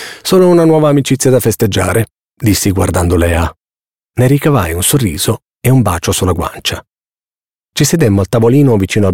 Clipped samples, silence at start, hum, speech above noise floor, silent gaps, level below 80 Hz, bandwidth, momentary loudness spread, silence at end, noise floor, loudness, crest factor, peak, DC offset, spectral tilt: under 0.1%; 0 s; none; over 80 dB; 2.23-2.27 s, 5.56-5.60 s; -30 dBFS; 17 kHz; 9 LU; 0 s; under -90 dBFS; -11 LUFS; 10 dB; 0 dBFS; 0.8%; -5.5 dB/octave